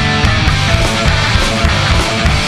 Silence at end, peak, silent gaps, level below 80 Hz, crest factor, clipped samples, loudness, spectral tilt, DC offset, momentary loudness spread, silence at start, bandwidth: 0 s; 0 dBFS; none; -18 dBFS; 12 dB; under 0.1%; -12 LUFS; -4.5 dB/octave; 0.8%; 1 LU; 0 s; 14 kHz